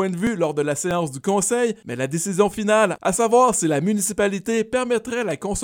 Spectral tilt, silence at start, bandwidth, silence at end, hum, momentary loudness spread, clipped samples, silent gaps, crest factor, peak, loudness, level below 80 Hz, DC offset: -4.5 dB/octave; 0 s; 18.5 kHz; 0 s; none; 7 LU; under 0.1%; none; 16 dB; -4 dBFS; -21 LUFS; -50 dBFS; under 0.1%